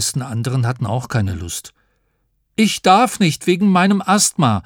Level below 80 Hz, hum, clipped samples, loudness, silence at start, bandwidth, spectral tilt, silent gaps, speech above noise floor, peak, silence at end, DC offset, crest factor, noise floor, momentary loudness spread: -48 dBFS; none; under 0.1%; -16 LUFS; 0 s; 18.5 kHz; -4.5 dB/octave; none; 49 dB; 0 dBFS; 0.05 s; under 0.1%; 16 dB; -66 dBFS; 11 LU